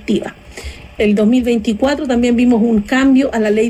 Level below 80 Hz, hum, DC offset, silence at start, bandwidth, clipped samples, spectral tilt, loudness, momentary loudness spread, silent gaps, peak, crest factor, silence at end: -36 dBFS; none; under 0.1%; 0 s; 10.5 kHz; under 0.1%; -6 dB/octave; -14 LUFS; 18 LU; none; -4 dBFS; 10 dB; 0 s